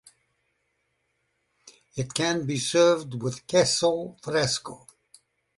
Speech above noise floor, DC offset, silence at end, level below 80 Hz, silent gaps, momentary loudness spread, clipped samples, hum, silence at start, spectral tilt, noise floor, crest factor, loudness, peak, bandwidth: 50 dB; under 0.1%; 0.8 s; -62 dBFS; none; 11 LU; under 0.1%; none; 1.65 s; -4 dB/octave; -75 dBFS; 20 dB; -25 LUFS; -8 dBFS; 11.5 kHz